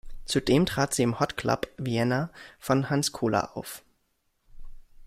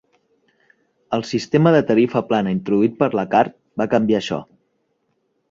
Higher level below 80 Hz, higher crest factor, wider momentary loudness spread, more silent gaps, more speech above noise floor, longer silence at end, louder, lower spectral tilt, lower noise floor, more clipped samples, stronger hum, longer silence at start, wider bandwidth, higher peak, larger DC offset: first, -48 dBFS vs -58 dBFS; about the same, 20 dB vs 18 dB; first, 14 LU vs 11 LU; neither; second, 46 dB vs 51 dB; second, 0 s vs 1.05 s; second, -27 LUFS vs -19 LUFS; second, -5 dB/octave vs -7 dB/octave; first, -73 dBFS vs -68 dBFS; neither; neither; second, 0.05 s vs 1.1 s; first, 16 kHz vs 7.8 kHz; second, -8 dBFS vs -2 dBFS; neither